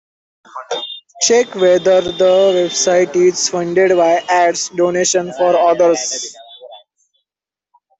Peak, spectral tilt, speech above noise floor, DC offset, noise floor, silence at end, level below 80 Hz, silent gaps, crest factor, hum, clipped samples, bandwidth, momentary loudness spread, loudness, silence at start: -2 dBFS; -3 dB/octave; 75 dB; under 0.1%; -88 dBFS; 1.2 s; -58 dBFS; none; 14 dB; none; under 0.1%; 8.4 kHz; 12 LU; -14 LUFS; 0.55 s